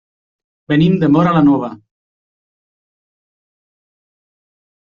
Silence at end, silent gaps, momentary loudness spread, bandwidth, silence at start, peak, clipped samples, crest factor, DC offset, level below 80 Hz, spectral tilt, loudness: 3.05 s; none; 7 LU; 6.8 kHz; 0.7 s; -2 dBFS; under 0.1%; 16 dB; under 0.1%; -52 dBFS; -7 dB/octave; -13 LUFS